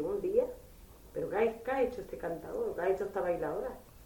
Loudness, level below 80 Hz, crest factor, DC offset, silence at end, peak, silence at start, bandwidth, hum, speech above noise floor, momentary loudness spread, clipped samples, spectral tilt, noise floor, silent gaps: -35 LUFS; -56 dBFS; 18 dB; under 0.1%; 0 s; -16 dBFS; 0 s; 19 kHz; none; 19 dB; 9 LU; under 0.1%; -6.5 dB/octave; -54 dBFS; none